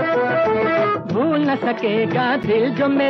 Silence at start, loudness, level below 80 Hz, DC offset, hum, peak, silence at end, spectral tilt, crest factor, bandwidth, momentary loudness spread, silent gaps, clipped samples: 0 s; -19 LUFS; -60 dBFS; under 0.1%; none; -8 dBFS; 0 s; -8 dB/octave; 10 dB; 6.4 kHz; 2 LU; none; under 0.1%